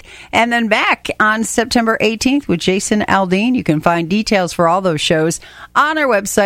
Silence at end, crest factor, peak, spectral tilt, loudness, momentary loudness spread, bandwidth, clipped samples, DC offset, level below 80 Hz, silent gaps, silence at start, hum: 0 s; 14 dB; 0 dBFS; -4 dB/octave; -14 LUFS; 3 LU; 16.5 kHz; under 0.1%; under 0.1%; -44 dBFS; none; 0.1 s; none